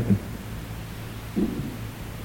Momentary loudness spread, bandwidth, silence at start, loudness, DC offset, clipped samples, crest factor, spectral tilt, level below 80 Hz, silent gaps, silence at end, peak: 10 LU; 17 kHz; 0 s; -31 LUFS; under 0.1%; under 0.1%; 20 dB; -7 dB/octave; -42 dBFS; none; 0 s; -10 dBFS